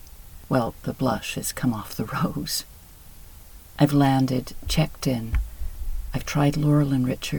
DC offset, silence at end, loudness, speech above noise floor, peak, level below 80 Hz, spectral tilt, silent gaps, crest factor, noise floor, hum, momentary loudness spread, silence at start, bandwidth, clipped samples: under 0.1%; 0 s; -24 LUFS; 22 dB; -4 dBFS; -36 dBFS; -6 dB/octave; none; 20 dB; -45 dBFS; none; 12 LU; 0.05 s; 19 kHz; under 0.1%